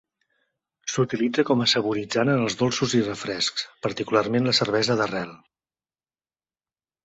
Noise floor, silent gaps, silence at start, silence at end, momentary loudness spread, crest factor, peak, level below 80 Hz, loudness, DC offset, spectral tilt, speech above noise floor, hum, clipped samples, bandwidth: under -90 dBFS; none; 0.85 s; 1.7 s; 9 LU; 20 dB; -6 dBFS; -62 dBFS; -23 LUFS; under 0.1%; -4.5 dB/octave; over 67 dB; none; under 0.1%; 8.4 kHz